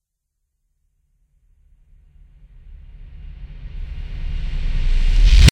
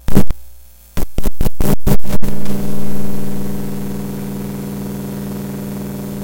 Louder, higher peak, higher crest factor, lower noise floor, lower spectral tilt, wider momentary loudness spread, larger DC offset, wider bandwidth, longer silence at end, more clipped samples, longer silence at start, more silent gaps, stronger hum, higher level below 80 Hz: about the same, -22 LUFS vs -23 LUFS; about the same, 0 dBFS vs 0 dBFS; first, 18 dB vs 10 dB; first, -75 dBFS vs -39 dBFS; second, -4.5 dB/octave vs -6.5 dB/octave; first, 26 LU vs 7 LU; neither; second, 8.8 kHz vs 17.5 kHz; about the same, 0 s vs 0 s; second, under 0.1% vs 2%; first, 2.65 s vs 0.1 s; neither; second, none vs 60 Hz at -35 dBFS; about the same, -20 dBFS vs -24 dBFS